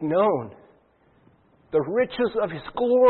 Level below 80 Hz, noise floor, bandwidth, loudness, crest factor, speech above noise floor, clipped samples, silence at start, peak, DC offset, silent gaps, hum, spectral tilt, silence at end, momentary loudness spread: -60 dBFS; -60 dBFS; 4.3 kHz; -25 LUFS; 16 dB; 39 dB; under 0.1%; 0 s; -8 dBFS; under 0.1%; none; none; -10.5 dB/octave; 0 s; 8 LU